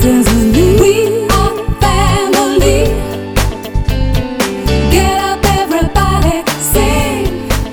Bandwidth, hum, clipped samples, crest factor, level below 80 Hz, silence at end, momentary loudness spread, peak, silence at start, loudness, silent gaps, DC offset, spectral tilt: over 20 kHz; none; under 0.1%; 10 dB; -18 dBFS; 0 s; 7 LU; 0 dBFS; 0 s; -12 LUFS; none; under 0.1%; -5 dB/octave